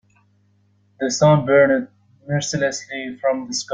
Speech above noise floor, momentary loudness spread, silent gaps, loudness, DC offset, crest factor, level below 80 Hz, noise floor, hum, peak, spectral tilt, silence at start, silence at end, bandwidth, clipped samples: 41 dB; 13 LU; none; -19 LUFS; under 0.1%; 18 dB; -56 dBFS; -60 dBFS; none; -2 dBFS; -5 dB/octave; 1 s; 0 s; 9.4 kHz; under 0.1%